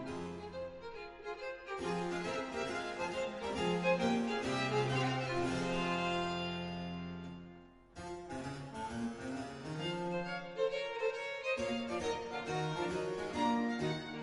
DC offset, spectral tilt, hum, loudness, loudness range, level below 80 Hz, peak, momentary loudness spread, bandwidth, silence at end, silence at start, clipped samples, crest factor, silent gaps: under 0.1%; -5.5 dB/octave; none; -38 LUFS; 8 LU; -62 dBFS; -20 dBFS; 12 LU; 11.5 kHz; 0 s; 0 s; under 0.1%; 18 dB; none